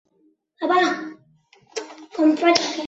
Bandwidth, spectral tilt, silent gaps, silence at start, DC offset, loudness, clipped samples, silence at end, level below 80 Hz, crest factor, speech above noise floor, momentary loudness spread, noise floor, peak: 8 kHz; -2.5 dB/octave; none; 0.6 s; under 0.1%; -20 LUFS; under 0.1%; 0 s; -70 dBFS; 20 dB; 44 dB; 17 LU; -63 dBFS; -2 dBFS